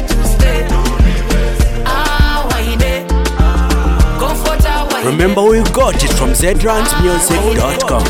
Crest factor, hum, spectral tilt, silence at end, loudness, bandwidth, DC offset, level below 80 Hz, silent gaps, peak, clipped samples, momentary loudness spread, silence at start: 10 dB; none; -4.5 dB/octave; 0 s; -13 LUFS; 17 kHz; under 0.1%; -14 dBFS; none; 0 dBFS; under 0.1%; 4 LU; 0 s